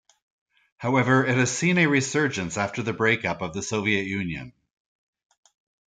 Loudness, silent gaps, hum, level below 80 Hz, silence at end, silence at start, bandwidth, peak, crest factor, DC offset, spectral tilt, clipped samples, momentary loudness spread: -23 LUFS; none; none; -60 dBFS; 1.4 s; 0.8 s; 9.6 kHz; -6 dBFS; 20 dB; under 0.1%; -5 dB/octave; under 0.1%; 10 LU